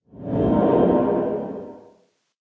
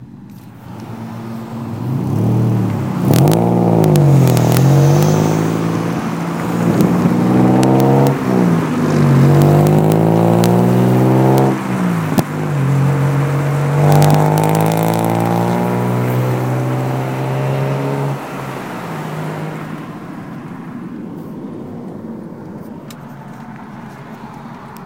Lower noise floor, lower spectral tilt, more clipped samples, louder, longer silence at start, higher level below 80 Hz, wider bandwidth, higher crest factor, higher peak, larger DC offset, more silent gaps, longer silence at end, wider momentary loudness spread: first, -60 dBFS vs -35 dBFS; first, -11 dB/octave vs -7.5 dB/octave; neither; second, -20 LUFS vs -14 LUFS; first, 0.15 s vs 0 s; about the same, -44 dBFS vs -48 dBFS; second, 4.3 kHz vs 17 kHz; about the same, 16 dB vs 14 dB; second, -6 dBFS vs 0 dBFS; neither; neither; first, 0.6 s vs 0 s; second, 17 LU vs 20 LU